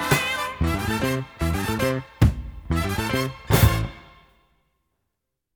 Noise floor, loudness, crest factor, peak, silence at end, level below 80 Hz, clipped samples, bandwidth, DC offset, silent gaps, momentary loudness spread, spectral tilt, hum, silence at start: -80 dBFS; -23 LUFS; 22 dB; -2 dBFS; 1.55 s; -32 dBFS; under 0.1%; over 20 kHz; under 0.1%; none; 8 LU; -5.5 dB/octave; none; 0 s